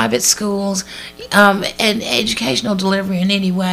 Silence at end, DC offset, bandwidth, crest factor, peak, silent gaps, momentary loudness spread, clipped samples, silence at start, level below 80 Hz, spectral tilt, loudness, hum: 0 s; under 0.1%; 16 kHz; 16 dB; 0 dBFS; none; 9 LU; under 0.1%; 0 s; -48 dBFS; -3.5 dB/octave; -15 LUFS; none